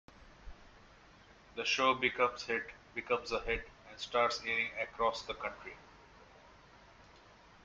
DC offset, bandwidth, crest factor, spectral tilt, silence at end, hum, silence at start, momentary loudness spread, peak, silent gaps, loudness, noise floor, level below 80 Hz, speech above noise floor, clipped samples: under 0.1%; 8 kHz; 22 dB; -2.5 dB/octave; 0.45 s; none; 0.2 s; 19 LU; -16 dBFS; none; -35 LUFS; -60 dBFS; -60 dBFS; 25 dB; under 0.1%